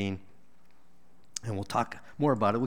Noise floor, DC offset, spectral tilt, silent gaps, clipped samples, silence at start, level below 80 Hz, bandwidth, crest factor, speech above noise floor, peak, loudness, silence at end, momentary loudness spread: -66 dBFS; 0.5%; -6 dB/octave; none; under 0.1%; 0 s; -66 dBFS; 17.5 kHz; 20 dB; 36 dB; -12 dBFS; -32 LUFS; 0 s; 14 LU